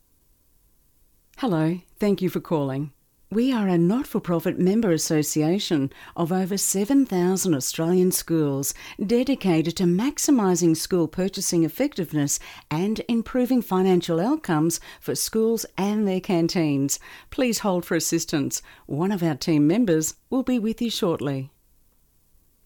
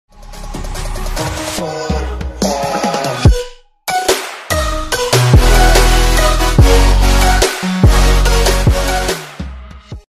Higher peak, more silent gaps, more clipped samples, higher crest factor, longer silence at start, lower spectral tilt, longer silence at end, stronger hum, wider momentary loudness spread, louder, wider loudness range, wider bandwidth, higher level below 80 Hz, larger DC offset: second, -10 dBFS vs 0 dBFS; neither; neither; about the same, 12 dB vs 12 dB; first, 1.4 s vs 0.2 s; about the same, -5 dB/octave vs -4.5 dB/octave; first, 1.2 s vs 0.1 s; neither; second, 7 LU vs 16 LU; second, -23 LUFS vs -13 LUFS; second, 2 LU vs 6 LU; first, 19 kHz vs 15.5 kHz; second, -54 dBFS vs -14 dBFS; neither